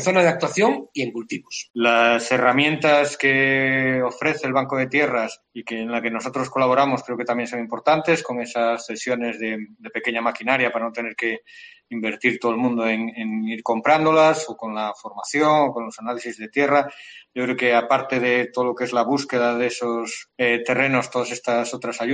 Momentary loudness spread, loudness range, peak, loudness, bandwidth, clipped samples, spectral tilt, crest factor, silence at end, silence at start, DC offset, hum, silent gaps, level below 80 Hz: 12 LU; 5 LU; -4 dBFS; -21 LUFS; 9.6 kHz; under 0.1%; -4.5 dB/octave; 18 dB; 0 s; 0 s; under 0.1%; none; 1.70-1.74 s; -66 dBFS